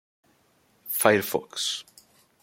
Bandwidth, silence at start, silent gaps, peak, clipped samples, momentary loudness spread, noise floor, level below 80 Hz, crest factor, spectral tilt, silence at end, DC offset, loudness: 16.5 kHz; 0.85 s; none; -2 dBFS; under 0.1%; 13 LU; -65 dBFS; -70 dBFS; 26 dB; -2.5 dB/octave; 0.6 s; under 0.1%; -25 LUFS